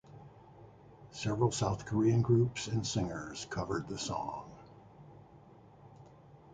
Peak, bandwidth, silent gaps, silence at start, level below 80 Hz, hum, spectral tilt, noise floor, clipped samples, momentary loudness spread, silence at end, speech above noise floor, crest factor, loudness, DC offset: -16 dBFS; 9.4 kHz; none; 0.1 s; -58 dBFS; none; -6 dB/octave; -57 dBFS; under 0.1%; 26 LU; 0 s; 25 dB; 20 dB; -34 LUFS; under 0.1%